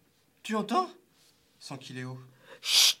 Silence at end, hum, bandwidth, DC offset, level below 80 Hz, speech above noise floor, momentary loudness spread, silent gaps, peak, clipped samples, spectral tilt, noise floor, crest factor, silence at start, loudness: 0.05 s; none; 17.5 kHz; under 0.1%; -84 dBFS; 31 dB; 24 LU; none; -8 dBFS; under 0.1%; -1.5 dB/octave; -65 dBFS; 22 dB; 0.45 s; -27 LUFS